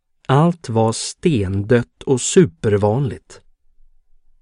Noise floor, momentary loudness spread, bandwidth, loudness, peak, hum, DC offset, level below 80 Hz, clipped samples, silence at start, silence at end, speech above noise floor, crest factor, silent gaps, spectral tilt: -50 dBFS; 6 LU; 11 kHz; -18 LUFS; 0 dBFS; none; under 0.1%; -48 dBFS; under 0.1%; 0.3 s; 1.05 s; 33 dB; 18 dB; none; -6 dB/octave